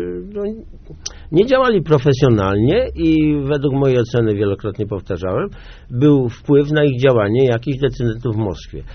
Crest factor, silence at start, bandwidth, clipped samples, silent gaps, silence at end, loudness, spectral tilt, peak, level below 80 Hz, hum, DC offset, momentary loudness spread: 16 dB; 0 s; 6.6 kHz; under 0.1%; none; 0 s; -16 LUFS; -7 dB/octave; 0 dBFS; -36 dBFS; none; under 0.1%; 12 LU